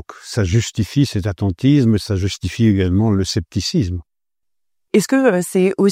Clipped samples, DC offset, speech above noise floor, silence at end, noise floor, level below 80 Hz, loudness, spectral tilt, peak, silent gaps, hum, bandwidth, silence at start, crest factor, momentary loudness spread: under 0.1%; under 0.1%; 65 dB; 0 s; -81 dBFS; -40 dBFS; -17 LUFS; -6 dB/octave; -2 dBFS; none; none; 15.5 kHz; 0.1 s; 16 dB; 7 LU